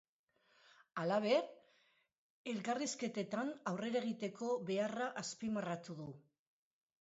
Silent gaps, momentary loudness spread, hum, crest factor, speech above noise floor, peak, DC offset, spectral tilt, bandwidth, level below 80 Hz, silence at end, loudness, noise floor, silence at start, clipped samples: 2.18-2.45 s; 14 LU; none; 20 dB; 35 dB; -22 dBFS; under 0.1%; -4.5 dB/octave; 8 kHz; -84 dBFS; 0.8 s; -40 LUFS; -75 dBFS; 0.95 s; under 0.1%